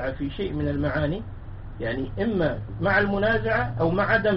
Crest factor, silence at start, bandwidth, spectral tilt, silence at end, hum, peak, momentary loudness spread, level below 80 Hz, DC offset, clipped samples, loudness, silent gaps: 18 dB; 0 s; 5.8 kHz; -5 dB/octave; 0 s; none; -8 dBFS; 12 LU; -38 dBFS; under 0.1%; under 0.1%; -25 LUFS; none